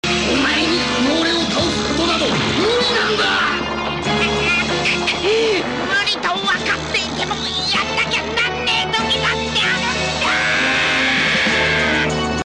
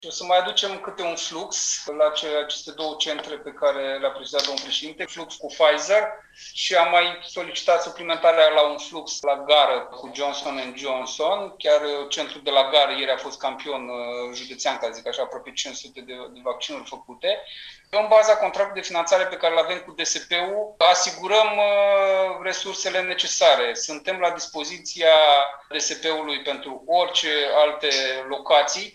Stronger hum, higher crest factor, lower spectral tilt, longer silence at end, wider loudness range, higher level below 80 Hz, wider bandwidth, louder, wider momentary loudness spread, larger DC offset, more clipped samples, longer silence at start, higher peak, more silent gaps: neither; second, 10 dB vs 20 dB; first, -3 dB/octave vs 0 dB/octave; about the same, 0.05 s vs 0.05 s; second, 2 LU vs 6 LU; first, -38 dBFS vs -66 dBFS; about the same, 10.5 kHz vs 10 kHz; first, -16 LUFS vs -22 LUFS; second, 4 LU vs 14 LU; neither; neither; about the same, 0.05 s vs 0 s; second, -8 dBFS vs -2 dBFS; neither